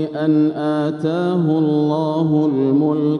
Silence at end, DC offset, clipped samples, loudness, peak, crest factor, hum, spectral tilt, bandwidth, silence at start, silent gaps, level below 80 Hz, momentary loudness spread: 0 s; under 0.1%; under 0.1%; -17 LUFS; -6 dBFS; 10 dB; none; -9.5 dB/octave; 6.2 kHz; 0 s; none; -66 dBFS; 3 LU